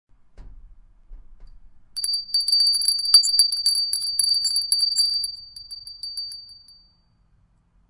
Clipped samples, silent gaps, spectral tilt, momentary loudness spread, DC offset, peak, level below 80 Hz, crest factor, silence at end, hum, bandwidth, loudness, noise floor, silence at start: under 0.1%; none; 3.5 dB/octave; 21 LU; under 0.1%; 0 dBFS; -52 dBFS; 24 dB; 1.35 s; none; 11.5 kHz; -18 LUFS; -61 dBFS; 0.4 s